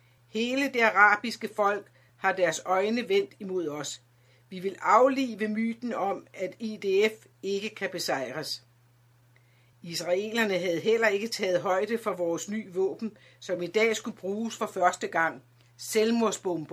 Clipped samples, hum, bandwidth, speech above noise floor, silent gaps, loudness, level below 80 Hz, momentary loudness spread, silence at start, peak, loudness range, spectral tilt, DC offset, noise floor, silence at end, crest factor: under 0.1%; none; 16 kHz; 34 dB; none; -28 LUFS; -78 dBFS; 13 LU; 0.35 s; -6 dBFS; 6 LU; -3.5 dB/octave; under 0.1%; -62 dBFS; 0 s; 22 dB